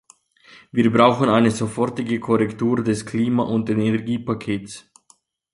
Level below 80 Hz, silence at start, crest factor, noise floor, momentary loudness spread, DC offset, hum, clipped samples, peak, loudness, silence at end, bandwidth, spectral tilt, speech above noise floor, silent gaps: -56 dBFS; 0.75 s; 18 dB; -59 dBFS; 11 LU; under 0.1%; none; under 0.1%; -2 dBFS; -20 LUFS; 0.75 s; 11.5 kHz; -6.5 dB/octave; 39 dB; none